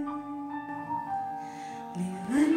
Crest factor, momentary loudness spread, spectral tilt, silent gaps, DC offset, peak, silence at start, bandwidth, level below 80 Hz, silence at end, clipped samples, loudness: 16 dB; 9 LU; -6.5 dB/octave; none; under 0.1%; -14 dBFS; 0 s; 13 kHz; -68 dBFS; 0 s; under 0.1%; -34 LUFS